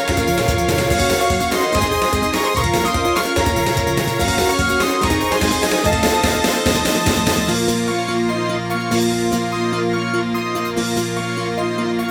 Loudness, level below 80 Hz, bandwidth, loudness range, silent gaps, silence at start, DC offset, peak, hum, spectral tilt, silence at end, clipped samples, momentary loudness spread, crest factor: -18 LUFS; -32 dBFS; 19 kHz; 3 LU; none; 0 s; under 0.1%; -2 dBFS; none; -4 dB/octave; 0 s; under 0.1%; 5 LU; 16 dB